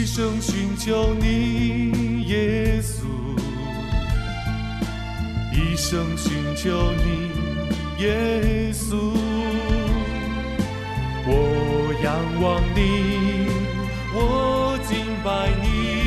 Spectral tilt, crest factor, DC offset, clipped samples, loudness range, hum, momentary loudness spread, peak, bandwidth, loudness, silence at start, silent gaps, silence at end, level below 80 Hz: -5.5 dB/octave; 16 dB; under 0.1%; under 0.1%; 3 LU; none; 6 LU; -6 dBFS; 14 kHz; -23 LUFS; 0 s; none; 0 s; -28 dBFS